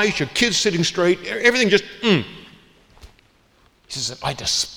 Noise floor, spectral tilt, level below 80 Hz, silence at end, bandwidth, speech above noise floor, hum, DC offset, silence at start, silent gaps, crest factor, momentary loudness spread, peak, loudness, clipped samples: -57 dBFS; -3 dB/octave; -50 dBFS; 0 s; 19 kHz; 37 dB; none; under 0.1%; 0 s; none; 20 dB; 10 LU; 0 dBFS; -19 LUFS; under 0.1%